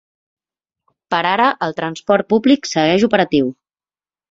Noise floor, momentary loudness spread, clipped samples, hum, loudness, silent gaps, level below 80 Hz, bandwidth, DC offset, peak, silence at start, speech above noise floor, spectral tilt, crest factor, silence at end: under -90 dBFS; 8 LU; under 0.1%; none; -16 LUFS; none; -56 dBFS; 7.8 kHz; under 0.1%; -2 dBFS; 1.1 s; over 75 dB; -5 dB/octave; 16 dB; 0.8 s